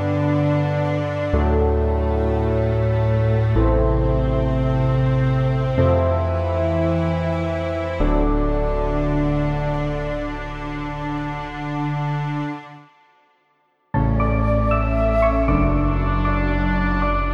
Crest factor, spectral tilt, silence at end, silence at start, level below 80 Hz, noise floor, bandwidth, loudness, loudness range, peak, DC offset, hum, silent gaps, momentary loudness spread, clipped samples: 14 dB; -9 dB/octave; 0 s; 0 s; -26 dBFS; -64 dBFS; 7 kHz; -21 LUFS; 7 LU; -4 dBFS; under 0.1%; none; none; 8 LU; under 0.1%